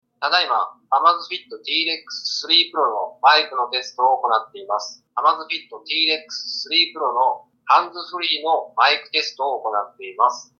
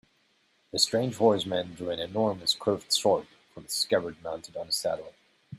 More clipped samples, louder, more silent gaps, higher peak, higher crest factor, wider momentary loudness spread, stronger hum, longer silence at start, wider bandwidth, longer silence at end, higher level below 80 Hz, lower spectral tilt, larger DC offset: neither; first, -19 LUFS vs -28 LUFS; neither; first, -2 dBFS vs -8 dBFS; about the same, 18 dB vs 20 dB; about the same, 11 LU vs 12 LU; neither; second, 0.2 s vs 0.75 s; second, 7.4 kHz vs 16 kHz; first, 0.15 s vs 0 s; second, -84 dBFS vs -68 dBFS; second, 0 dB/octave vs -3.5 dB/octave; neither